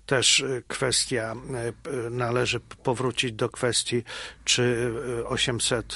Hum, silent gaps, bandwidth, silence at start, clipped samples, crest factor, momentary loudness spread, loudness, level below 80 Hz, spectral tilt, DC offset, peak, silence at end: none; none; 11.5 kHz; 0.1 s; under 0.1%; 20 dB; 10 LU; -25 LUFS; -52 dBFS; -3 dB/octave; under 0.1%; -6 dBFS; 0 s